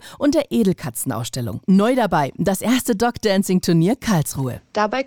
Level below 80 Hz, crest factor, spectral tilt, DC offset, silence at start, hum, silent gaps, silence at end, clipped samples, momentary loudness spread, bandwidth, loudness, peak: -48 dBFS; 12 dB; -5.5 dB/octave; 0.3%; 0.05 s; none; none; 0 s; under 0.1%; 8 LU; 19.5 kHz; -19 LUFS; -6 dBFS